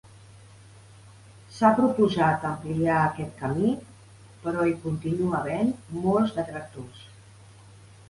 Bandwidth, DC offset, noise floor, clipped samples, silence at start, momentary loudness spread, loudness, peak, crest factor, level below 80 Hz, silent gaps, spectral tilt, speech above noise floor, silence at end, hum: 11.5 kHz; under 0.1%; -50 dBFS; under 0.1%; 1.05 s; 14 LU; -25 LUFS; -8 dBFS; 20 dB; -56 dBFS; none; -7.5 dB/octave; 25 dB; 0.95 s; none